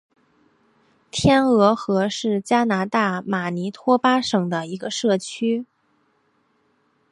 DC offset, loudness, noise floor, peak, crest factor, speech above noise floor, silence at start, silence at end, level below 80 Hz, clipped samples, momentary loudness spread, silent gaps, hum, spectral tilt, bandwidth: under 0.1%; -21 LUFS; -65 dBFS; -2 dBFS; 20 dB; 45 dB; 1.15 s; 1.5 s; -52 dBFS; under 0.1%; 9 LU; none; none; -5 dB/octave; 11.5 kHz